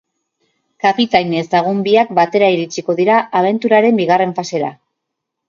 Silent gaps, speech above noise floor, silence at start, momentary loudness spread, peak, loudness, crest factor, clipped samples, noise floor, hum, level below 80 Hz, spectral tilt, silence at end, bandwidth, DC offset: none; 63 dB; 0.85 s; 7 LU; 0 dBFS; -14 LUFS; 14 dB; under 0.1%; -77 dBFS; none; -60 dBFS; -5.5 dB/octave; 0.75 s; 7.4 kHz; under 0.1%